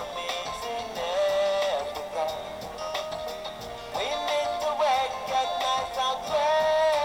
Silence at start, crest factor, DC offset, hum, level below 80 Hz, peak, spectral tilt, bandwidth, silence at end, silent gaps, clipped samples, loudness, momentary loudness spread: 0 s; 14 dB; under 0.1%; none; -56 dBFS; -14 dBFS; -2 dB/octave; 17 kHz; 0 s; none; under 0.1%; -28 LUFS; 11 LU